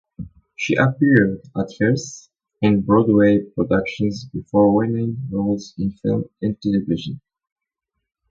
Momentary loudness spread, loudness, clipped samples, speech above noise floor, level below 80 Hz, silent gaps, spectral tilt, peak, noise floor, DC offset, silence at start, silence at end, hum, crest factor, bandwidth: 15 LU; -19 LUFS; under 0.1%; 61 dB; -48 dBFS; none; -7 dB/octave; 0 dBFS; -80 dBFS; under 0.1%; 0.2 s; 1.15 s; none; 20 dB; 7.6 kHz